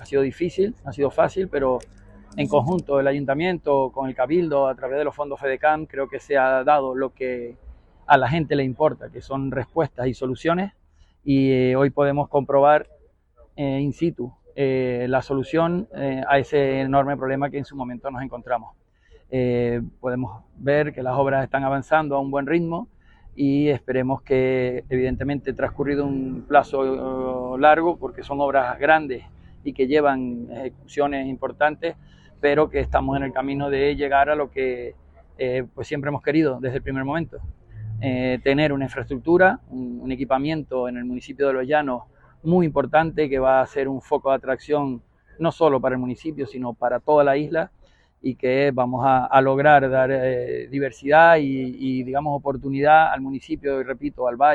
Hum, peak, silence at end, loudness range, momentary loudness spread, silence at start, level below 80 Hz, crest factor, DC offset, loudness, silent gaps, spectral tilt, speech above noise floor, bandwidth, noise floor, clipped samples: none; 0 dBFS; 0 s; 5 LU; 12 LU; 0 s; -46 dBFS; 20 dB; under 0.1%; -22 LUFS; none; -8 dB/octave; 34 dB; 8.6 kHz; -55 dBFS; under 0.1%